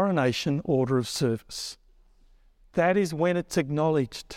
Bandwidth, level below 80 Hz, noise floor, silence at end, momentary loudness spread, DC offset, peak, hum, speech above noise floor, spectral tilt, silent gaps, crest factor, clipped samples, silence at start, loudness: 16.5 kHz; -56 dBFS; -58 dBFS; 0 s; 8 LU; under 0.1%; -10 dBFS; none; 32 dB; -5.5 dB/octave; none; 16 dB; under 0.1%; 0 s; -26 LUFS